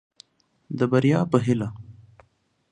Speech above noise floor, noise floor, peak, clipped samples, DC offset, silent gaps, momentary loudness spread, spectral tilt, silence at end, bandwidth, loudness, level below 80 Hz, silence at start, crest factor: 45 dB; -66 dBFS; -4 dBFS; under 0.1%; under 0.1%; none; 15 LU; -8 dB/octave; 0.8 s; 10.5 kHz; -23 LUFS; -58 dBFS; 0.7 s; 22 dB